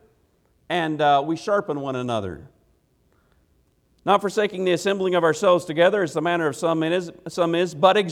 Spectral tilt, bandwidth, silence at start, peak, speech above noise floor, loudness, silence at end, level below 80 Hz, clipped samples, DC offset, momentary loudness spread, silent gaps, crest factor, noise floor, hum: -5 dB/octave; 14.5 kHz; 0.7 s; -2 dBFS; 42 dB; -22 LUFS; 0 s; -62 dBFS; under 0.1%; under 0.1%; 9 LU; none; 20 dB; -63 dBFS; none